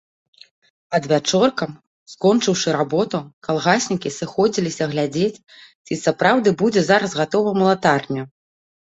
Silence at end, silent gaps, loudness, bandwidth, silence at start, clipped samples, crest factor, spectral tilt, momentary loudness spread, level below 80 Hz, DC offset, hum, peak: 0.7 s; 1.87-2.06 s, 3.33-3.41 s, 5.75-5.85 s; -19 LUFS; 8.2 kHz; 0.9 s; under 0.1%; 18 dB; -4.5 dB/octave; 9 LU; -60 dBFS; under 0.1%; none; 0 dBFS